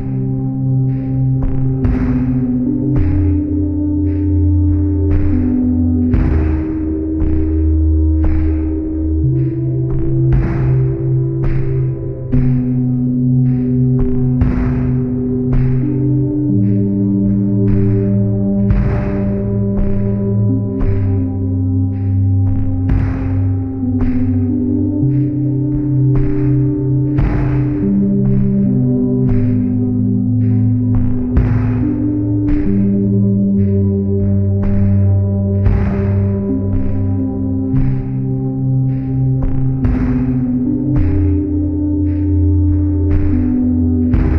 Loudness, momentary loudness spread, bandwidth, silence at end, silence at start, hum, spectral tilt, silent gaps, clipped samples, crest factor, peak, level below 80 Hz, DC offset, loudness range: -15 LUFS; 4 LU; 3 kHz; 0 s; 0 s; none; -13 dB/octave; none; under 0.1%; 12 dB; 0 dBFS; -22 dBFS; under 0.1%; 2 LU